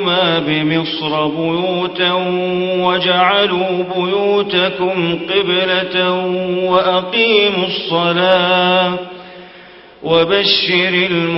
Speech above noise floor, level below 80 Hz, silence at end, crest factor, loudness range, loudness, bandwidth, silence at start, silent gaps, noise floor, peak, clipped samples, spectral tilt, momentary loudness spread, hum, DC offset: 25 dB; -54 dBFS; 0 s; 14 dB; 2 LU; -14 LUFS; 5.8 kHz; 0 s; none; -39 dBFS; 0 dBFS; under 0.1%; -8.5 dB/octave; 6 LU; none; under 0.1%